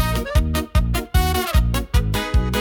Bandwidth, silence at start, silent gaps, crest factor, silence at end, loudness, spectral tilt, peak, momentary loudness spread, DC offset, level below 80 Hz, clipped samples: 19 kHz; 0 s; none; 12 dB; 0 s; -21 LUFS; -5 dB/octave; -6 dBFS; 2 LU; under 0.1%; -22 dBFS; under 0.1%